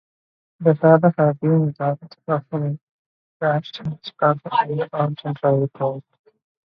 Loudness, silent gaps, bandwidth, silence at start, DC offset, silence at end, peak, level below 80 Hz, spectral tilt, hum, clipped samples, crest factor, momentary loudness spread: -21 LUFS; 2.81-3.40 s; 5.4 kHz; 0.6 s; under 0.1%; 0.65 s; 0 dBFS; -66 dBFS; -10 dB/octave; none; under 0.1%; 20 dB; 15 LU